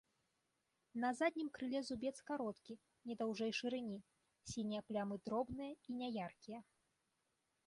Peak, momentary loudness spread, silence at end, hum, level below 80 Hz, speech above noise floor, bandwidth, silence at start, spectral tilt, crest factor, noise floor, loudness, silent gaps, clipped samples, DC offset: -26 dBFS; 14 LU; 1.05 s; none; -76 dBFS; 42 dB; 11.5 kHz; 0.95 s; -5 dB/octave; 18 dB; -86 dBFS; -44 LUFS; none; under 0.1%; under 0.1%